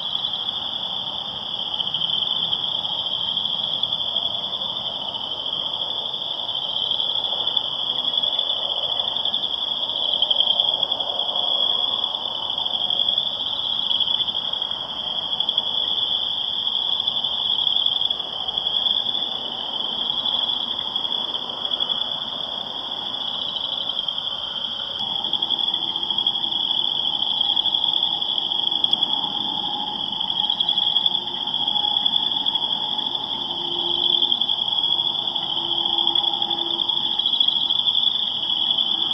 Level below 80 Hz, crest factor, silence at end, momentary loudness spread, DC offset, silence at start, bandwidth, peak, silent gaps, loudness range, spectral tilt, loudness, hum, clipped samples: -60 dBFS; 20 dB; 0 s; 7 LU; under 0.1%; 0 s; 9 kHz; -4 dBFS; none; 4 LU; -3 dB/octave; -20 LUFS; none; under 0.1%